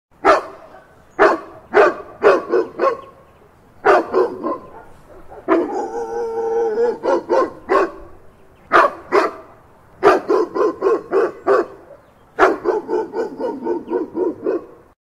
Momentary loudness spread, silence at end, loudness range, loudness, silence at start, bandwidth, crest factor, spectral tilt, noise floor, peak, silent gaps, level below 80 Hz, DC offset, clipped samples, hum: 10 LU; 0.4 s; 4 LU; -18 LUFS; 0.25 s; 11.5 kHz; 18 dB; -5 dB/octave; -48 dBFS; 0 dBFS; none; -52 dBFS; under 0.1%; under 0.1%; none